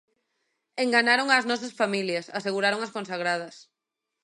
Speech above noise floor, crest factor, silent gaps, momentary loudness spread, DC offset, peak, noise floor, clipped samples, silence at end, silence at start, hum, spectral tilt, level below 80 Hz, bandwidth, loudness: 59 dB; 20 dB; none; 11 LU; under 0.1%; -6 dBFS; -85 dBFS; under 0.1%; 0.6 s; 0.75 s; none; -3.5 dB/octave; -82 dBFS; 11.5 kHz; -25 LUFS